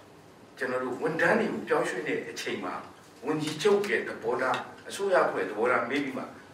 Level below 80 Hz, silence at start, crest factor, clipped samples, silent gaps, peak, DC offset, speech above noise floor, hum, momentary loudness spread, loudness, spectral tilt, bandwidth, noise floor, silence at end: -76 dBFS; 0 s; 18 dB; under 0.1%; none; -12 dBFS; under 0.1%; 24 dB; none; 11 LU; -29 LUFS; -4.5 dB/octave; 16 kHz; -52 dBFS; 0 s